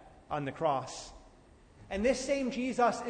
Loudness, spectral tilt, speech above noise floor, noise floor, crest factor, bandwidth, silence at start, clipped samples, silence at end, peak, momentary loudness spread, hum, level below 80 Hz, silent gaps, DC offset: -33 LUFS; -4.5 dB/octave; 27 dB; -59 dBFS; 18 dB; 9.6 kHz; 0 s; under 0.1%; 0 s; -16 dBFS; 14 LU; none; -56 dBFS; none; under 0.1%